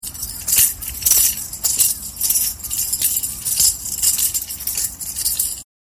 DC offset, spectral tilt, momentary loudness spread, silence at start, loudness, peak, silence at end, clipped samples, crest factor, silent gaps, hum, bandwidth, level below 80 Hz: under 0.1%; 1 dB/octave; 8 LU; 0.05 s; -17 LUFS; 0 dBFS; 0.35 s; under 0.1%; 20 dB; none; none; 17.5 kHz; -42 dBFS